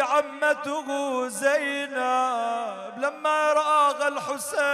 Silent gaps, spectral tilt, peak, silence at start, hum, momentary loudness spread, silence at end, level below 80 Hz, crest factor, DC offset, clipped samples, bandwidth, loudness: none; -1.5 dB/octave; -10 dBFS; 0 s; none; 9 LU; 0 s; -82 dBFS; 14 dB; under 0.1%; under 0.1%; 14.5 kHz; -25 LUFS